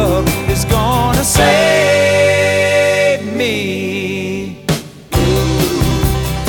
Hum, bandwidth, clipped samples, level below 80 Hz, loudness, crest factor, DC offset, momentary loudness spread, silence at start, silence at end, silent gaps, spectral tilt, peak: none; 19.5 kHz; under 0.1%; -26 dBFS; -13 LUFS; 14 dB; under 0.1%; 9 LU; 0 s; 0 s; none; -4.5 dB/octave; 0 dBFS